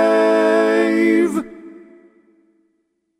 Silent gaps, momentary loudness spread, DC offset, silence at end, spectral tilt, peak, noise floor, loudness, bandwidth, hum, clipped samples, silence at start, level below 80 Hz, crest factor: none; 9 LU; under 0.1%; 1.4 s; -5.5 dB/octave; -4 dBFS; -68 dBFS; -16 LUFS; 12.5 kHz; none; under 0.1%; 0 s; -64 dBFS; 14 dB